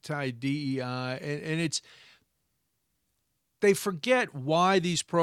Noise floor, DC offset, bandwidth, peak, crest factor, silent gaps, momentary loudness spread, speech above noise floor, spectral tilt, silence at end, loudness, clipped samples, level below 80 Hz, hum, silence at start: -78 dBFS; under 0.1%; 15.5 kHz; -10 dBFS; 18 dB; none; 9 LU; 50 dB; -4.5 dB/octave; 0 s; -28 LUFS; under 0.1%; -72 dBFS; none; 0.05 s